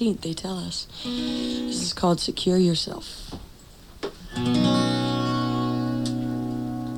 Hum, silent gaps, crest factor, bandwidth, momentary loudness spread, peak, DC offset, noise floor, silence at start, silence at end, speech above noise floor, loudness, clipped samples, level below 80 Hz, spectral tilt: none; none; 16 dB; 17.5 kHz; 15 LU; -10 dBFS; under 0.1%; -47 dBFS; 0 s; 0 s; 22 dB; -25 LUFS; under 0.1%; -48 dBFS; -5.5 dB/octave